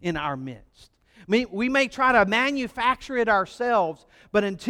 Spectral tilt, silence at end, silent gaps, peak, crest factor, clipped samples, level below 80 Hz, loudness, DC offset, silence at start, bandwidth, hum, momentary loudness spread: -5 dB/octave; 0 s; none; -6 dBFS; 18 dB; under 0.1%; -54 dBFS; -23 LUFS; under 0.1%; 0.05 s; 15 kHz; none; 11 LU